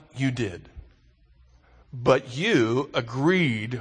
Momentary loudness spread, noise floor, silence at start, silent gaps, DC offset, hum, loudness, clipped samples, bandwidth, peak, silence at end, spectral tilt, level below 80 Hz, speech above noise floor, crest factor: 10 LU; -58 dBFS; 0.15 s; none; under 0.1%; none; -24 LUFS; under 0.1%; 9.8 kHz; -4 dBFS; 0 s; -6 dB/octave; -54 dBFS; 34 dB; 22 dB